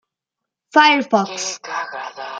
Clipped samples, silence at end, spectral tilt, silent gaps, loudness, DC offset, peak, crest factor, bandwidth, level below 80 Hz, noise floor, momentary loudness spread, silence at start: under 0.1%; 0 s; -2.5 dB/octave; none; -17 LUFS; under 0.1%; -2 dBFS; 18 dB; 9.4 kHz; -72 dBFS; -84 dBFS; 15 LU; 0.75 s